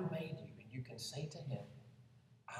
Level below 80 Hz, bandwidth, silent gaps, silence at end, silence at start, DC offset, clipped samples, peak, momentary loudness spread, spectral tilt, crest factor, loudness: -78 dBFS; 14 kHz; none; 0 s; 0 s; under 0.1%; under 0.1%; -30 dBFS; 18 LU; -5.5 dB/octave; 16 dB; -47 LUFS